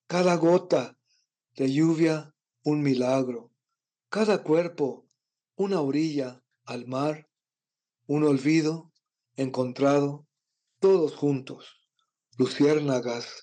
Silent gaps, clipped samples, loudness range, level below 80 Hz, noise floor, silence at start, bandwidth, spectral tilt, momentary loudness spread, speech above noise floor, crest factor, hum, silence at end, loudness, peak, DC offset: none; under 0.1%; 3 LU; -84 dBFS; under -90 dBFS; 0.1 s; 9.4 kHz; -6.5 dB/octave; 16 LU; over 65 dB; 14 dB; none; 0 s; -26 LUFS; -14 dBFS; under 0.1%